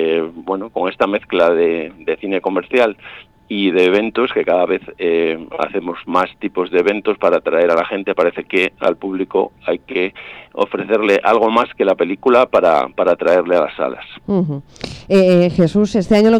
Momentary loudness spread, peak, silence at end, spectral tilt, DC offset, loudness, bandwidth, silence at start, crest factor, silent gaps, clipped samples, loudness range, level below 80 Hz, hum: 10 LU; -2 dBFS; 0 s; -6.5 dB/octave; under 0.1%; -16 LUFS; 10.5 kHz; 0 s; 14 dB; none; under 0.1%; 3 LU; -50 dBFS; none